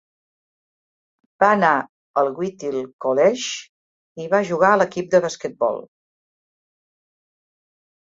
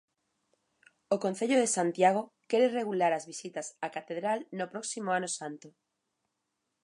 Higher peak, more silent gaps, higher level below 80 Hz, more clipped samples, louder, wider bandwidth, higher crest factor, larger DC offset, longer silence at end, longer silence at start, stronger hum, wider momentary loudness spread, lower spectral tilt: first, -2 dBFS vs -12 dBFS; first, 1.89-2.14 s, 2.93-2.99 s, 3.69-4.15 s vs none; first, -68 dBFS vs -86 dBFS; neither; first, -20 LUFS vs -31 LUFS; second, 7.8 kHz vs 11.5 kHz; about the same, 20 dB vs 20 dB; neither; first, 2.3 s vs 1.15 s; first, 1.4 s vs 1.1 s; neither; about the same, 11 LU vs 12 LU; about the same, -4.5 dB/octave vs -4 dB/octave